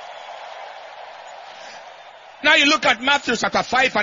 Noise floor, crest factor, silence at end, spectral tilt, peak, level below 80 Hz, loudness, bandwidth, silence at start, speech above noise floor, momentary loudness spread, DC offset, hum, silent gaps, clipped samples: -42 dBFS; 20 dB; 0 s; -2 dB/octave; 0 dBFS; -58 dBFS; -17 LUFS; 7.6 kHz; 0 s; 25 dB; 24 LU; under 0.1%; none; none; under 0.1%